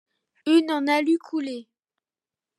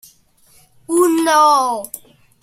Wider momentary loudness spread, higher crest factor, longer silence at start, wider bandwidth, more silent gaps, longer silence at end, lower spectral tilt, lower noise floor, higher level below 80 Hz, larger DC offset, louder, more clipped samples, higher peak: second, 13 LU vs 18 LU; about the same, 16 dB vs 16 dB; second, 0.45 s vs 0.9 s; second, 12 kHz vs 16.5 kHz; neither; first, 0.95 s vs 0.45 s; about the same, -3 dB/octave vs -2 dB/octave; first, under -90 dBFS vs -52 dBFS; second, -88 dBFS vs -64 dBFS; neither; second, -23 LUFS vs -14 LUFS; neither; second, -8 dBFS vs -2 dBFS